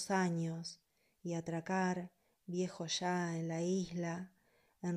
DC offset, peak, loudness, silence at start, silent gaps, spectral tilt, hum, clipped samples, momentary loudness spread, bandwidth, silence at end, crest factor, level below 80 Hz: under 0.1%; -24 dBFS; -39 LUFS; 0 s; none; -5 dB/octave; none; under 0.1%; 14 LU; 11.5 kHz; 0 s; 16 dB; -78 dBFS